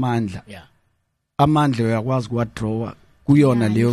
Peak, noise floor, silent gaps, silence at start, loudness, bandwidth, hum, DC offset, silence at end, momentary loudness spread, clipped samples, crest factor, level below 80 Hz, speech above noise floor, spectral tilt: -4 dBFS; -70 dBFS; none; 0 s; -19 LUFS; 12.5 kHz; none; under 0.1%; 0 s; 16 LU; under 0.1%; 16 dB; -48 dBFS; 52 dB; -8 dB/octave